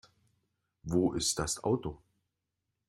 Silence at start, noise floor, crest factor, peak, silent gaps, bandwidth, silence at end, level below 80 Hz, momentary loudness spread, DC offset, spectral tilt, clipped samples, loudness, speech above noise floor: 0.85 s; -86 dBFS; 20 dB; -16 dBFS; none; 16 kHz; 0.95 s; -56 dBFS; 11 LU; under 0.1%; -4.5 dB/octave; under 0.1%; -32 LUFS; 54 dB